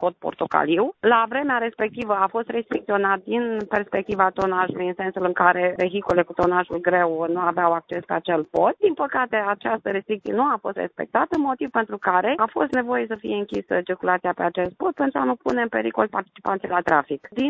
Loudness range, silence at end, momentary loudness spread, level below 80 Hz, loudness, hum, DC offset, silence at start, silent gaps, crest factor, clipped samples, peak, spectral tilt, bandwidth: 2 LU; 0 s; 7 LU; -58 dBFS; -22 LUFS; none; under 0.1%; 0 s; none; 20 dB; under 0.1%; -2 dBFS; -7 dB/octave; 8 kHz